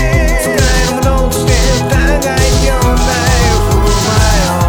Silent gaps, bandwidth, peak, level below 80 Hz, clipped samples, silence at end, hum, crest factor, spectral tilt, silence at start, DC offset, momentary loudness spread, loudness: none; 20 kHz; 0 dBFS; -14 dBFS; under 0.1%; 0 s; none; 10 dB; -4.5 dB/octave; 0 s; under 0.1%; 2 LU; -11 LUFS